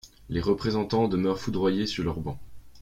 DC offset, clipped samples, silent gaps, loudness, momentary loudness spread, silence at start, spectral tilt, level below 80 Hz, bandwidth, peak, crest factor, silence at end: under 0.1%; under 0.1%; none; -27 LUFS; 9 LU; 0.05 s; -6.5 dB/octave; -48 dBFS; 15.5 kHz; -10 dBFS; 18 dB; 0 s